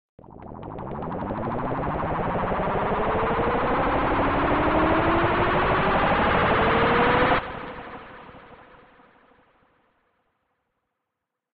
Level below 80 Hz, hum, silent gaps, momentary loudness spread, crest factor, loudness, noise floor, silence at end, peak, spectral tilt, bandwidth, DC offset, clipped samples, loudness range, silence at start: -38 dBFS; none; none; 17 LU; 16 dB; -23 LUFS; -83 dBFS; 3 s; -8 dBFS; -9.5 dB/octave; 5.4 kHz; under 0.1%; under 0.1%; 7 LU; 0.3 s